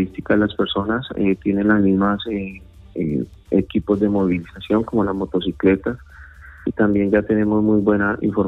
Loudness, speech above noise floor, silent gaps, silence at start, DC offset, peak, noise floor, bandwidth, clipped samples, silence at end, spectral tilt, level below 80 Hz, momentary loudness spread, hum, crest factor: -19 LUFS; 22 dB; none; 0 s; under 0.1%; -4 dBFS; -41 dBFS; 4.1 kHz; under 0.1%; 0 s; -9 dB/octave; -42 dBFS; 10 LU; none; 14 dB